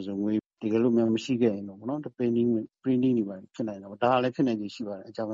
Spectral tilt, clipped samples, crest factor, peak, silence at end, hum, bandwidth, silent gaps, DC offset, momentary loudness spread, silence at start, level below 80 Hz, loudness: -7.5 dB/octave; under 0.1%; 18 dB; -10 dBFS; 0 s; none; 7.6 kHz; 0.46-0.50 s; under 0.1%; 11 LU; 0 s; -70 dBFS; -28 LUFS